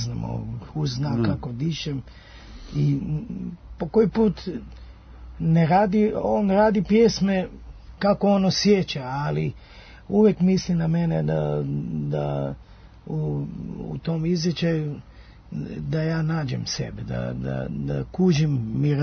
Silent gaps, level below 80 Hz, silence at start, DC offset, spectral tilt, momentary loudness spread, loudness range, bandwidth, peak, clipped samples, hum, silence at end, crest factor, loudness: none; -44 dBFS; 0 s; under 0.1%; -7 dB/octave; 14 LU; 7 LU; 6.6 kHz; -6 dBFS; under 0.1%; none; 0 s; 16 dB; -24 LUFS